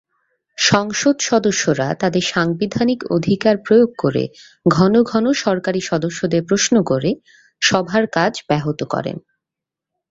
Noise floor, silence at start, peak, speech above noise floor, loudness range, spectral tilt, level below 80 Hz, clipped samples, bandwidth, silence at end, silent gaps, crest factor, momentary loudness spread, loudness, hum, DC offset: -85 dBFS; 0.6 s; 0 dBFS; 68 dB; 2 LU; -4.5 dB/octave; -54 dBFS; under 0.1%; 8 kHz; 0.9 s; none; 18 dB; 8 LU; -17 LUFS; none; under 0.1%